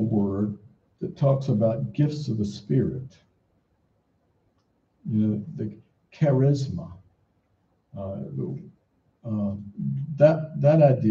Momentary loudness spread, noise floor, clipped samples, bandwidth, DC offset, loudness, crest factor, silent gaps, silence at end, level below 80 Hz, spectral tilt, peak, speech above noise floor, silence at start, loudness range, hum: 18 LU; -69 dBFS; under 0.1%; 7.4 kHz; under 0.1%; -25 LUFS; 22 dB; none; 0 s; -60 dBFS; -9.5 dB/octave; -4 dBFS; 45 dB; 0 s; 7 LU; none